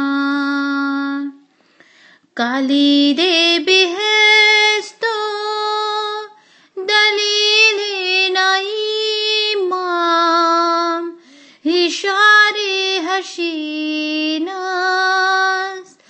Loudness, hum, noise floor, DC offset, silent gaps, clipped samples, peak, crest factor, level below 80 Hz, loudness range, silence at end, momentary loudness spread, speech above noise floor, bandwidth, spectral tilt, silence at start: -14 LUFS; none; -52 dBFS; under 0.1%; none; under 0.1%; 0 dBFS; 16 dB; -84 dBFS; 4 LU; 0.25 s; 12 LU; 38 dB; 8.8 kHz; -0.5 dB/octave; 0 s